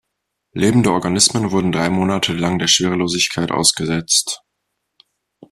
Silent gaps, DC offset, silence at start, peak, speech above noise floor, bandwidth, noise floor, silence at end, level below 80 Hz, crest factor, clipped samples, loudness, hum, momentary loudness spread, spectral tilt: none; under 0.1%; 0.55 s; 0 dBFS; 60 dB; 14 kHz; -76 dBFS; 1.15 s; -50 dBFS; 18 dB; under 0.1%; -16 LUFS; none; 5 LU; -3.5 dB/octave